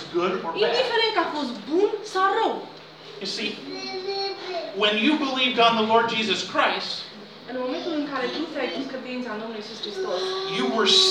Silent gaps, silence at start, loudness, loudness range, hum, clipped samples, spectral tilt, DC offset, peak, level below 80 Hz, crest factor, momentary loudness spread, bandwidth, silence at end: none; 0 s; -24 LUFS; 7 LU; none; under 0.1%; -3 dB/octave; under 0.1%; -4 dBFS; -72 dBFS; 20 dB; 13 LU; 12 kHz; 0 s